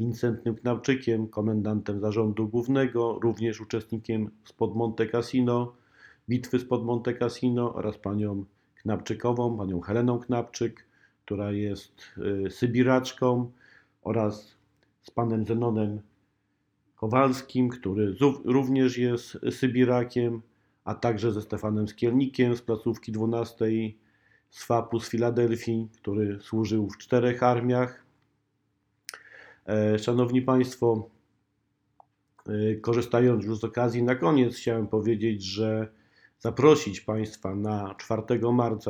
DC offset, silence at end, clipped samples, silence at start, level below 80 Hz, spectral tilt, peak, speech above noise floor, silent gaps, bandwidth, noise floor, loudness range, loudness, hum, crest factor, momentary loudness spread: under 0.1%; 0 s; under 0.1%; 0 s; -62 dBFS; -7 dB/octave; -6 dBFS; 48 dB; none; 14 kHz; -74 dBFS; 4 LU; -27 LUFS; none; 22 dB; 10 LU